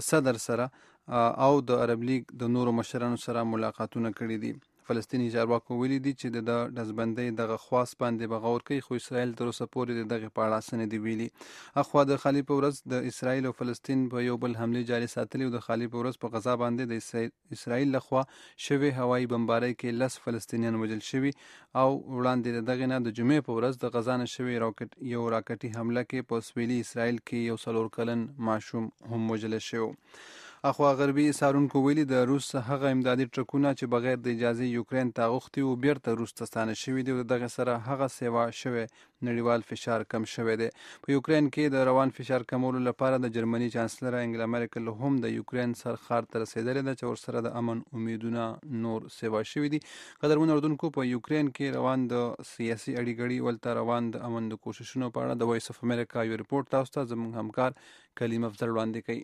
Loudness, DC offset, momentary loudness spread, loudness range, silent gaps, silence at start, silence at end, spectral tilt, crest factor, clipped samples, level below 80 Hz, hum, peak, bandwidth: -30 LUFS; under 0.1%; 8 LU; 4 LU; none; 0 s; 0 s; -6.5 dB/octave; 20 dB; under 0.1%; -70 dBFS; none; -8 dBFS; 13.5 kHz